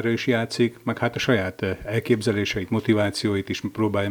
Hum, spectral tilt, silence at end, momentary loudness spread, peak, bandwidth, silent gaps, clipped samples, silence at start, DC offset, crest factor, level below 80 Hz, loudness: none; -6 dB/octave; 0 s; 5 LU; -6 dBFS; over 20 kHz; none; under 0.1%; 0 s; under 0.1%; 18 dB; -52 dBFS; -24 LUFS